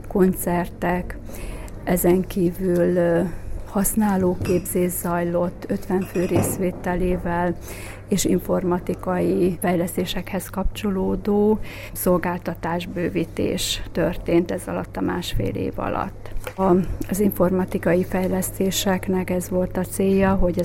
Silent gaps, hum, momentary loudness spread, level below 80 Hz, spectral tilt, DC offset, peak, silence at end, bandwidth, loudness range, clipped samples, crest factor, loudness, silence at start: none; none; 8 LU; -34 dBFS; -5.5 dB/octave; under 0.1%; -4 dBFS; 0 s; 16.5 kHz; 3 LU; under 0.1%; 18 dB; -22 LUFS; 0 s